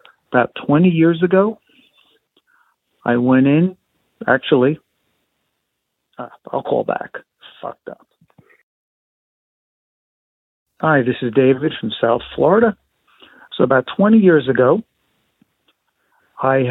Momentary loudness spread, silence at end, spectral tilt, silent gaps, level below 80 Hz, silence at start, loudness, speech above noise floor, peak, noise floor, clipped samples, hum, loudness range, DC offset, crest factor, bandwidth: 20 LU; 0 s; -10 dB/octave; 8.63-10.66 s; -58 dBFS; 0.3 s; -16 LUFS; 59 dB; -2 dBFS; -75 dBFS; under 0.1%; none; 11 LU; under 0.1%; 18 dB; 4.1 kHz